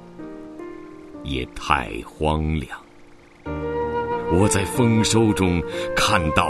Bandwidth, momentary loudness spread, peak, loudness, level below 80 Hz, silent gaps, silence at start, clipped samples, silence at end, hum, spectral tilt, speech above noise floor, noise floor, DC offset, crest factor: 12.5 kHz; 19 LU; 0 dBFS; -21 LUFS; -36 dBFS; none; 0 s; under 0.1%; 0 s; none; -5 dB/octave; 26 dB; -47 dBFS; under 0.1%; 22 dB